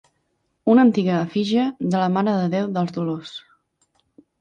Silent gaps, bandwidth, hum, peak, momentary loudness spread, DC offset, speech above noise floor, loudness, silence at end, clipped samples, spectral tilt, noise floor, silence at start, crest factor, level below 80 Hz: none; 8.8 kHz; none; -6 dBFS; 12 LU; under 0.1%; 51 dB; -20 LUFS; 1.05 s; under 0.1%; -7.5 dB/octave; -71 dBFS; 0.65 s; 16 dB; -66 dBFS